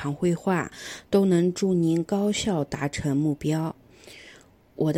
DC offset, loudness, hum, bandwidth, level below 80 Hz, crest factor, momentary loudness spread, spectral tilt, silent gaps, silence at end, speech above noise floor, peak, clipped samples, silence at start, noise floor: under 0.1%; -25 LUFS; none; 16 kHz; -54 dBFS; 16 dB; 16 LU; -6 dB/octave; none; 0 s; 28 dB; -10 dBFS; under 0.1%; 0 s; -53 dBFS